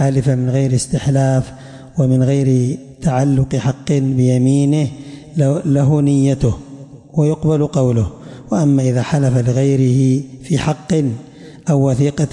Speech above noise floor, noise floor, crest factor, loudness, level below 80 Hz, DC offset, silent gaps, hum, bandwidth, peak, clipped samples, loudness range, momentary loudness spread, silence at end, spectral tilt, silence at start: 21 dB; -35 dBFS; 10 dB; -16 LUFS; -40 dBFS; under 0.1%; none; none; 11 kHz; -4 dBFS; under 0.1%; 1 LU; 10 LU; 0.05 s; -7.5 dB/octave; 0 s